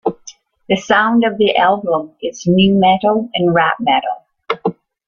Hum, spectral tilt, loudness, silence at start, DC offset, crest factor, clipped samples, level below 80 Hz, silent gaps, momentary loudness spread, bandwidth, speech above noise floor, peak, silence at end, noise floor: none; -5.5 dB/octave; -15 LUFS; 0.05 s; under 0.1%; 14 dB; under 0.1%; -50 dBFS; none; 12 LU; 7.2 kHz; 27 dB; -2 dBFS; 0.35 s; -41 dBFS